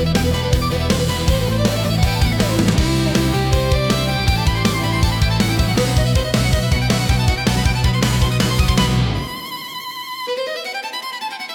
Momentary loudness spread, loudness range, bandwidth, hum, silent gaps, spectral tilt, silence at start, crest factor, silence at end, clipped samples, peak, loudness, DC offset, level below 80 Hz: 9 LU; 2 LU; 17.5 kHz; none; none; -5 dB/octave; 0 s; 14 dB; 0 s; under 0.1%; -4 dBFS; -18 LUFS; under 0.1%; -24 dBFS